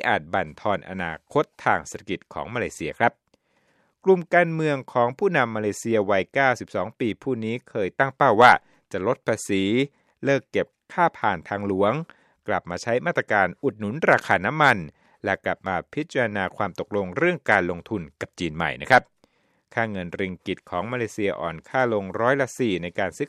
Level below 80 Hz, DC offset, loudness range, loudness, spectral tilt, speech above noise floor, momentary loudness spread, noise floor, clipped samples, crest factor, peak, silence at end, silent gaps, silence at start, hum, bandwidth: -58 dBFS; under 0.1%; 5 LU; -24 LUFS; -5.5 dB/octave; 43 dB; 11 LU; -66 dBFS; under 0.1%; 22 dB; -2 dBFS; 0 s; none; 0 s; none; 13.5 kHz